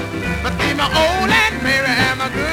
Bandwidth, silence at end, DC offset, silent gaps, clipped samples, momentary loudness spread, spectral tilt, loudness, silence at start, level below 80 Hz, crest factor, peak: 17.5 kHz; 0 s; under 0.1%; none; under 0.1%; 7 LU; -4 dB/octave; -16 LUFS; 0 s; -32 dBFS; 14 dB; -4 dBFS